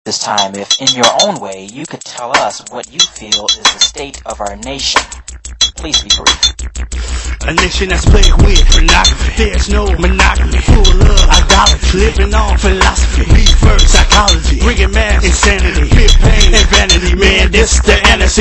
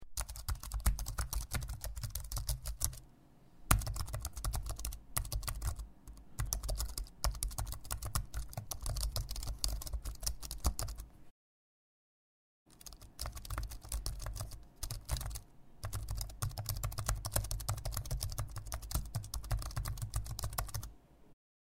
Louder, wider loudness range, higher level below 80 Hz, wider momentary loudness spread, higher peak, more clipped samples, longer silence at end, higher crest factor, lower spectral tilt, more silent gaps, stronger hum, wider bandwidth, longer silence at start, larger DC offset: first, -10 LUFS vs -41 LUFS; about the same, 4 LU vs 6 LU; first, -10 dBFS vs -42 dBFS; first, 14 LU vs 8 LU; first, 0 dBFS vs -6 dBFS; first, 1% vs under 0.1%; second, 0 s vs 0.3 s; second, 8 dB vs 34 dB; about the same, -3 dB/octave vs -3 dB/octave; second, none vs 11.31-12.66 s; neither; second, 11 kHz vs 16 kHz; about the same, 0.05 s vs 0 s; neither